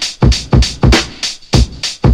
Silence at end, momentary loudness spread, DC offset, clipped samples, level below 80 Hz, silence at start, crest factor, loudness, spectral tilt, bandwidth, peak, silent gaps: 0 s; 7 LU; under 0.1%; under 0.1%; -16 dBFS; 0 s; 12 dB; -13 LUFS; -4.5 dB/octave; 13 kHz; 0 dBFS; none